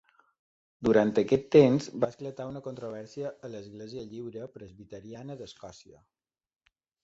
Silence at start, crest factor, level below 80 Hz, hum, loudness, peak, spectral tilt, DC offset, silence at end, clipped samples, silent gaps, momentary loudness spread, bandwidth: 0.8 s; 24 dB; -62 dBFS; none; -27 LUFS; -6 dBFS; -7 dB/octave; under 0.1%; 1.3 s; under 0.1%; none; 23 LU; 7.8 kHz